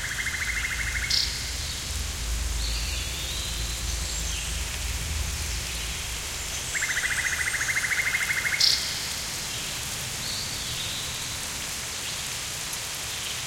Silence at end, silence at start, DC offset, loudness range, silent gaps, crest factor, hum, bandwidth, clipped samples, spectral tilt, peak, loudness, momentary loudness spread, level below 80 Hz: 0 s; 0 s; under 0.1%; 5 LU; none; 22 dB; none; 17 kHz; under 0.1%; -1 dB/octave; -8 dBFS; -27 LUFS; 6 LU; -36 dBFS